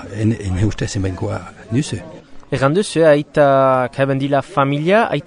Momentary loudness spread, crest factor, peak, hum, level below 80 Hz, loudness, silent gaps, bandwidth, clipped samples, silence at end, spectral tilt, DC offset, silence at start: 12 LU; 16 dB; 0 dBFS; none; -40 dBFS; -17 LUFS; none; 10.5 kHz; under 0.1%; 0.05 s; -6.5 dB/octave; under 0.1%; 0 s